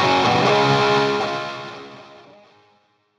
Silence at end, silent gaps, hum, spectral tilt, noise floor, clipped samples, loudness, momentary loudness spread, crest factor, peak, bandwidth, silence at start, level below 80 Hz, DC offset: 1.05 s; none; none; -5 dB/octave; -61 dBFS; under 0.1%; -18 LUFS; 20 LU; 16 dB; -4 dBFS; 11.5 kHz; 0 s; -58 dBFS; under 0.1%